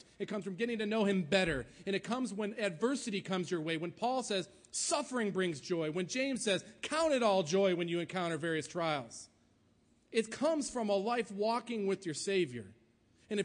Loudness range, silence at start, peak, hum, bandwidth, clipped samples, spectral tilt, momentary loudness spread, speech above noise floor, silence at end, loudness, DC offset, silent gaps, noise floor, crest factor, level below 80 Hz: 3 LU; 0.2 s; -16 dBFS; none; 10.5 kHz; under 0.1%; -4 dB/octave; 7 LU; 35 dB; 0 s; -35 LUFS; under 0.1%; none; -70 dBFS; 18 dB; -66 dBFS